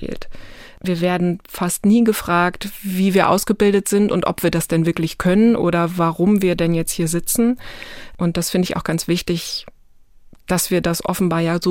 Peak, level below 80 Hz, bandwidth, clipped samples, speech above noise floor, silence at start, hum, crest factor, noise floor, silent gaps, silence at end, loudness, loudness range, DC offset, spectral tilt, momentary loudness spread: 0 dBFS; -42 dBFS; 17 kHz; under 0.1%; 29 dB; 0 s; none; 18 dB; -47 dBFS; none; 0 s; -18 LUFS; 5 LU; under 0.1%; -5.5 dB/octave; 10 LU